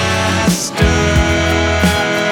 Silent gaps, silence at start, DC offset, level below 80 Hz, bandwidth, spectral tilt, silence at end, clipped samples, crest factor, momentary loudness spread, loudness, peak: none; 0 s; under 0.1%; -24 dBFS; 18.5 kHz; -4.5 dB/octave; 0 s; under 0.1%; 12 dB; 2 LU; -13 LUFS; 0 dBFS